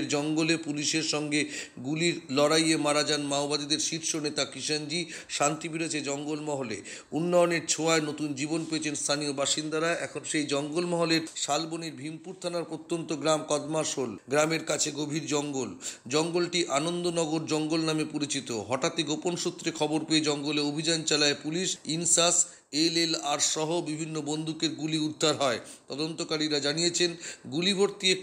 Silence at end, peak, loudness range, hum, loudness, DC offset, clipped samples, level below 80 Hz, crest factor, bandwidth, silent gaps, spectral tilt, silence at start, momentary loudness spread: 0 s; -10 dBFS; 4 LU; none; -28 LUFS; under 0.1%; under 0.1%; -76 dBFS; 20 dB; 16 kHz; none; -3 dB/octave; 0 s; 9 LU